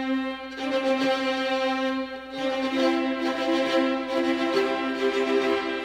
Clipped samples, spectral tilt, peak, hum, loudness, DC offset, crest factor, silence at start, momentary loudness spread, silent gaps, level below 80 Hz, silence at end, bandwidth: under 0.1%; -3.5 dB/octave; -10 dBFS; none; -25 LUFS; under 0.1%; 16 dB; 0 s; 5 LU; none; -60 dBFS; 0 s; 13 kHz